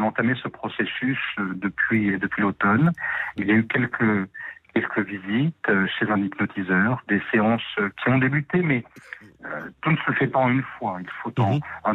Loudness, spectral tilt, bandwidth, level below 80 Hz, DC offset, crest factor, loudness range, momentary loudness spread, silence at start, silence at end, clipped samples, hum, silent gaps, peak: -23 LUFS; -8.5 dB/octave; 4.1 kHz; -60 dBFS; under 0.1%; 14 dB; 2 LU; 10 LU; 0 s; 0 s; under 0.1%; none; none; -10 dBFS